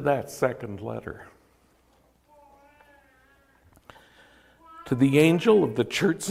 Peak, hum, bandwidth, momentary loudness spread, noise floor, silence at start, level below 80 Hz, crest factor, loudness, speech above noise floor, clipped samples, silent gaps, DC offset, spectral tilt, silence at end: -6 dBFS; none; 16 kHz; 20 LU; -63 dBFS; 0 s; -62 dBFS; 20 dB; -24 LUFS; 40 dB; under 0.1%; none; under 0.1%; -6 dB/octave; 0 s